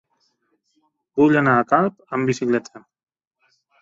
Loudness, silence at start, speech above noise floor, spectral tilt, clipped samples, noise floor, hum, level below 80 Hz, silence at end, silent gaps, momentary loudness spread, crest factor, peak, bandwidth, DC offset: -19 LUFS; 1.15 s; 50 dB; -7 dB/octave; under 0.1%; -69 dBFS; none; -62 dBFS; 1.05 s; none; 8 LU; 18 dB; -4 dBFS; 7.8 kHz; under 0.1%